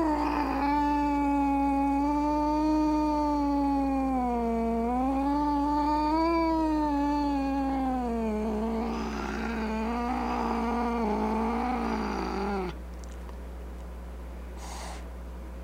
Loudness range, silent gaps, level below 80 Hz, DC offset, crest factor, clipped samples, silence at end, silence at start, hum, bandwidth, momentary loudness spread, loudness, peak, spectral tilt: 7 LU; none; -40 dBFS; under 0.1%; 12 dB; under 0.1%; 0 s; 0 s; none; 15.5 kHz; 16 LU; -28 LUFS; -16 dBFS; -7 dB/octave